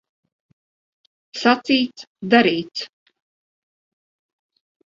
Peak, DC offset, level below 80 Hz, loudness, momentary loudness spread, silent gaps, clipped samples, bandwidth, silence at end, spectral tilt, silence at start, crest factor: 0 dBFS; under 0.1%; -70 dBFS; -19 LUFS; 18 LU; 2.07-2.15 s; under 0.1%; 7.6 kHz; 2 s; -5 dB/octave; 1.35 s; 24 dB